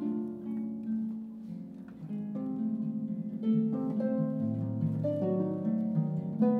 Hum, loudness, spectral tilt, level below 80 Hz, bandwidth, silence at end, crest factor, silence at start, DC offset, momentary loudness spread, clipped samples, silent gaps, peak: none; -33 LUFS; -11.5 dB/octave; -74 dBFS; 3.3 kHz; 0 s; 16 dB; 0 s; under 0.1%; 11 LU; under 0.1%; none; -16 dBFS